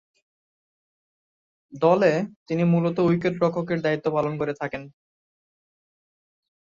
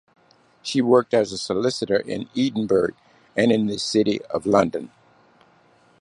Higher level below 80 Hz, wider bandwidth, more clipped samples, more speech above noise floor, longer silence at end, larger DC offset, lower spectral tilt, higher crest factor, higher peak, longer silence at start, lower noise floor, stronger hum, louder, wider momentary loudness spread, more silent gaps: second, -64 dBFS vs -58 dBFS; second, 7.2 kHz vs 11 kHz; neither; first, over 67 dB vs 36 dB; first, 1.8 s vs 1.15 s; neither; first, -8 dB/octave vs -5 dB/octave; about the same, 20 dB vs 20 dB; second, -6 dBFS vs -2 dBFS; first, 1.7 s vs 0.65 s; first, under -90 dBFS vs -57 dBFS; neither; about the same, -23 LUFS vs -22 LUFS; about the same, 9 LU vs 10 LU; first, 2.36-2.46 s vs none